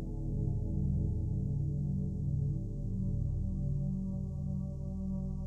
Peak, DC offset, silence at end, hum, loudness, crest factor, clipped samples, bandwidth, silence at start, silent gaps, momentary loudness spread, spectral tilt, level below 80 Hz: -22 dBFS; under 0.1%; 0 s; none; -36 LUFS; 12 dB; under 0.1%; 1.2 kHz; 0 s; none; 4 LU; -12 dB/octave; -40 dBFS